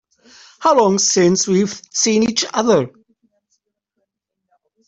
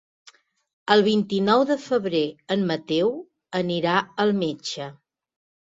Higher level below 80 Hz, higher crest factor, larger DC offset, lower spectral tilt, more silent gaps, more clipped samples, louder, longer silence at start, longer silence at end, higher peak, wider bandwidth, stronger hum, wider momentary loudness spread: first, -58 dBFS vs -66 dBFS; second, 16 dB vs 22 dB; neither; second, -3.5 dB/octave vs -5.5 dB/octave; neither; neither; first, -15 LUFS vs -23 LUFS; second, 0.6 s vs 0.85 s; first, 2 s vs 0.85 s; about the same, -2 dBFS vs -2 dBFS; about the same, 8.4 kHz vs 7.8 kHz; neither; second, 6 LU vs 12 LU